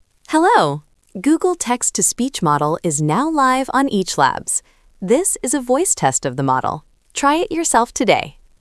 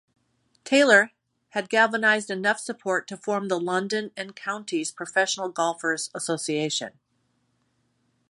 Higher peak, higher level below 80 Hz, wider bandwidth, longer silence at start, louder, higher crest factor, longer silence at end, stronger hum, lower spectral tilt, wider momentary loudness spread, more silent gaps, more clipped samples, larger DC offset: first, 0 dBFS vs -4 dBFS; first, -50 dBFS vs -78 dBFS; about the same, 12 kHz vs 11.5 kHz; second, 0.3 s vs 0.65 s; first, -17 LUFS vs -24 LUFS; about the same, 18 dB vs 22 dB; second, 0.3 s vs 1.4 s; neither; about the same, -3.5 dB/octave vs -3 dB/octave; second, 7 LU vs 12 LU; neither; neither; neither